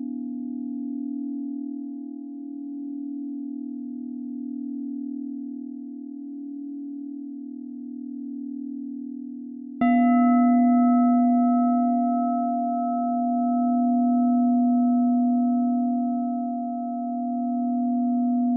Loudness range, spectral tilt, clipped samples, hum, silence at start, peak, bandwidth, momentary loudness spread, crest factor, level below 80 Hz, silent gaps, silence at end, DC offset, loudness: 14 LU; -11.5 dB/octave; under 0.1%; none; 0 s; -10 dBFS; 2.9 kHz; 17 LU; 14 dB; -74 dBFS; none; 0 s; under 0.1%; -24 LUFS